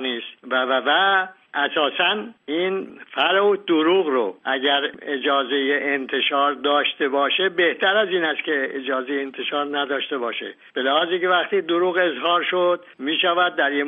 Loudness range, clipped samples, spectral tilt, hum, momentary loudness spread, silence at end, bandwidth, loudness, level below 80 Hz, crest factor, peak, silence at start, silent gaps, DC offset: 3 LU; under 0.1%; 0 dB/octave; none; 8 LU; 0 s; 3.9 kHz; -21 LUFS; -74 dBFS; 16 dB; -6 dBFS; 0 s; none; under 0.1%